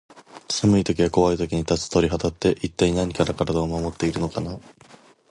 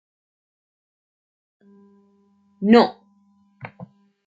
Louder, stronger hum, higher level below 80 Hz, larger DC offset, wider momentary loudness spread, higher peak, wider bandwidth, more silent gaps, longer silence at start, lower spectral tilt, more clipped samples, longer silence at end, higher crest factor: second, -22 LUFS vs -17 LUFS; neither; first, -40 dBFS vs -66 dBFS; neither; second, 8 LU vs 26 LU; second, -6 dBFS vs -2 dBFS; first, 11.5 kHz vs 7.6 kHz; neither; second, 0.15 s vs 2.6 s; second, -5.5 dB/octave vs -7.5 dB/octave; neither; first, 0.7 s vs 0.45 s; second, 18 dB vs 24 dB